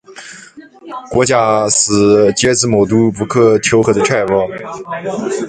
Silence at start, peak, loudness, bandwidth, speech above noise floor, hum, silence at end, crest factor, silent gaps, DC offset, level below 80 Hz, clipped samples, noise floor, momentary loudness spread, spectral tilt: 0.1 s; 0 dBFS; -12 LUFS; 9.6 kHz; 25 dB; none; 0 s; 14 dB; none; under 0.1%; -44 dBFS; under 0.1%; -37 dBFS; 17 LU; -4 dB/octave